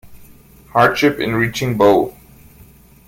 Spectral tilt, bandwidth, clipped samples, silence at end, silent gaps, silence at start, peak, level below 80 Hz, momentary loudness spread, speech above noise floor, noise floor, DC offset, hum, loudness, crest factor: -5.5 dB/octave; 17 kHz; under 0.1%; 0.95 s; none; 0.05 s; 0 dBFS; -46 dBFS; 7 LU; 30 dB; -45 dBFS; under 0.1%; none; -15 LUFS; 18 dB